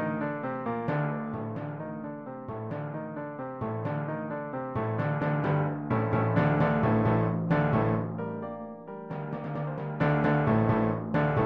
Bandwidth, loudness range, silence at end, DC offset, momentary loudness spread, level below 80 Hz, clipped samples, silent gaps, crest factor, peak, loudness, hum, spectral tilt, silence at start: 5.4 kHz; 8 LU; 0 s; under 0.1%; 12 LU; -52 dBFS; under 0.1%; none; 16 dB; -12 dBFS; -29 LUFS; none; -10.5 dB/octave; 0 s